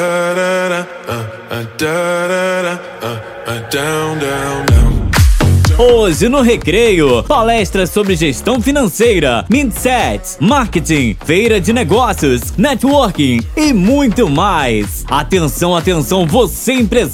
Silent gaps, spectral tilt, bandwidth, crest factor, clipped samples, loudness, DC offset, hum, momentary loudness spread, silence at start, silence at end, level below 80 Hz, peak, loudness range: none; -5 dB/octave; 17.5 kHz; 12 dB; under 0.1%; -12 LUFS; under 0.1%; none; 8 LU; 0 s; 0 s; -22 dBFS; 0 dBFS; 6 LU